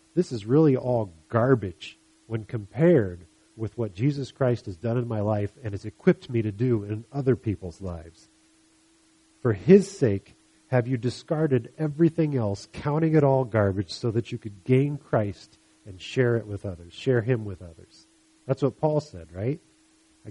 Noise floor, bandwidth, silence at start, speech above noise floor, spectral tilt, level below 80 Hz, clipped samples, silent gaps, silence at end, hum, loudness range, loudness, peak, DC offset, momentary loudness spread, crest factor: -61 dBFS; 11 kHz; 0.15 s; 36 dB; -8 dB/octave; -58 dBFS; under 0.1%; none; 0 s; none; 5 LU; -25 LUFS; -4 dBFS; under 0.1%; 15 LU; 22 dB